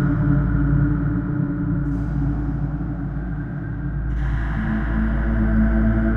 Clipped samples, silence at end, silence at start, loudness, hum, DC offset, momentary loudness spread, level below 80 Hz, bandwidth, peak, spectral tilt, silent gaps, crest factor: under 0.1%; 0 s; 0 s; -22 LUFS; none; under 0.1%; 8 LU; -24 dBFS; 3.5 kHz; -6 dBFS; -11 dB/octave; none; 14 dB